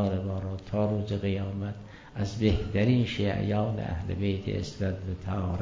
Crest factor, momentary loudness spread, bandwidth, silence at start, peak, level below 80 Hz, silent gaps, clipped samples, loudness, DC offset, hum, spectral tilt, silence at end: 18 dB; 9 LU; 7.6 kHz; 0 s; -12 dBFS; -42 dBFS; none; under 0.1%; -30 LUFS; under 0.1%; none; -7.5 dB/octave; 0 s